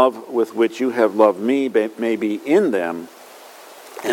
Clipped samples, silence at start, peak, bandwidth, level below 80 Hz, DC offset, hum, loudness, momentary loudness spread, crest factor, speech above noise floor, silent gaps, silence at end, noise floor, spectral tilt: under 0.1%; 0 s; 0 dBFS; 17 kHz; -78 dBFS; under 0.1%; none; -19 LUFS; 15 LU; 20 dB; 23 dB; none; 0 s; -41 dBFS; -5.5 dB/octave